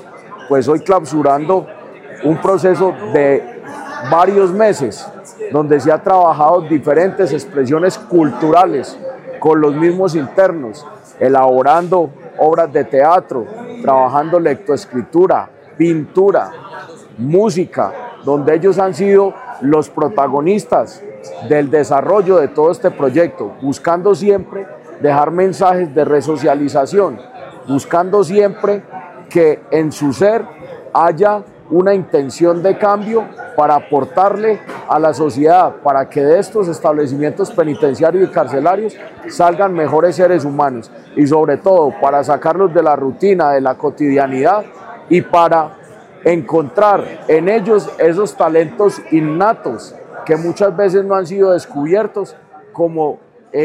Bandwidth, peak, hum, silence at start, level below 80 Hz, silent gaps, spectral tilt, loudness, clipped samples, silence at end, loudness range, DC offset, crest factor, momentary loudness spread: 12 kHz; 0 dBFS; none; 0.05 s; -60 dBFS; none; -7 dB/octave; -13 LUFS; under 0.1%; 0 s; 2 LU; under 0.1%; 12 dB; 13 LU